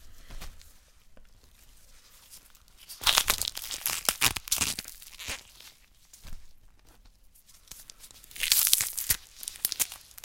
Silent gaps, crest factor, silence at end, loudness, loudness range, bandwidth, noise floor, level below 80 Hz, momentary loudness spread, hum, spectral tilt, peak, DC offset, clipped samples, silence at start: none; 34 dB; 0.2 s; -27 LUFS; 14 LU; 17 kHz; -57 dBFS; -50 dBFS; 25 LU; none; 0.5 dB/octave; 0 dBFS; under 0.1%; under 0.1%; 0 s